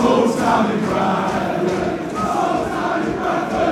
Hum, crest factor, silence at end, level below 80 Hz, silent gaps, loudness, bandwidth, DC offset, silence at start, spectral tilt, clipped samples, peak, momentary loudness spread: none; 16 dB; 0 s; -44 dBFS; none; -19 LUFS; 15.5 kHz; under 0.1%; 0 s; -6 dB/octave; under 0.1%; -4 dBFS; 5 LU